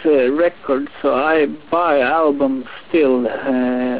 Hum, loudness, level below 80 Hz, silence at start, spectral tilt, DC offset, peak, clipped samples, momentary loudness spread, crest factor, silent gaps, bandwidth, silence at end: none; -17 LUFS; -54 dBFS; 0 s; -9 dB/octave; 0.8%; -4 dBFS; under 0.1%; 5 LU; 12 dB; none; 4 kHz; 0 s